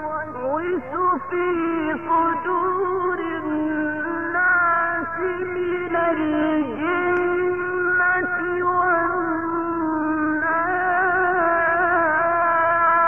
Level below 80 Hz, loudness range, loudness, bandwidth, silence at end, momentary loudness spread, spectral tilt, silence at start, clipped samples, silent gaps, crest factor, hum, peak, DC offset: -56 dBFS; 3 LU; -21 LUFS; 3.4 kHz; 0 s; 6 LU; -8.5 dB/octave; 0 s; under 0.1%; none; 12 dB; none; -10 dBFS; 0.5%